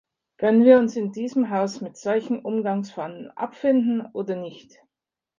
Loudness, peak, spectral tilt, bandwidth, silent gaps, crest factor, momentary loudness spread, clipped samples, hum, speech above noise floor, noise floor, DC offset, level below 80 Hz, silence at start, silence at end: -22 LUFS; -2 dBFS; -7 dB/octave; 7.4 kHz; none; 20 dB; 17 LU; under 0.1%; none; 66 dB; -88 dBFS; under 0.1%; -72 dBFS; 0.4 s; 0.8 s